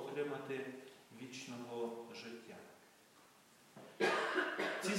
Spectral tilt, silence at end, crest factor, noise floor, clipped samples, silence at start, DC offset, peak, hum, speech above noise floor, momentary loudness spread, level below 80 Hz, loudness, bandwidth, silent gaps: -3.5 dB/octave; 0 s; 22 dB; -66 dBFS; under 0.1%; 0 s; under 0.1%; -22 dBFS; none; 24 dB; 22 LU; under -90 dBFS; -41 LUFS; 16 kHz; none